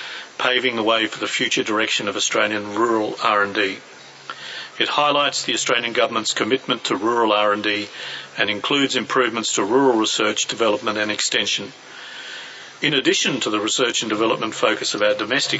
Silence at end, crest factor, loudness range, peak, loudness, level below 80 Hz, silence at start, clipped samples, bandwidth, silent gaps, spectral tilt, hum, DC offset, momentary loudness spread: 0 s; 20 dB; 2 LU; -2 dBFS; -19 LUFS; -72 dBFS; 0 s; under 0.1%; 8.2 kHz; none; -2 dB/octave; none; under 0.1%; 14 LU